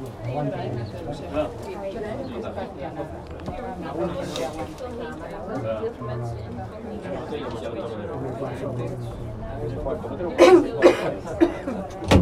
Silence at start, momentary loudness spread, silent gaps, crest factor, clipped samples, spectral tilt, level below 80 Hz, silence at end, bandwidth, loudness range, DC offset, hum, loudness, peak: 0 s; 15 LU; none; 24 dB; under 0.1%; -6.5 dB/octave; -42 dBFS; 0 s; 13.5 kHz; 11 LU; under 0.1%; none; -26 LUFS; 0 dBFS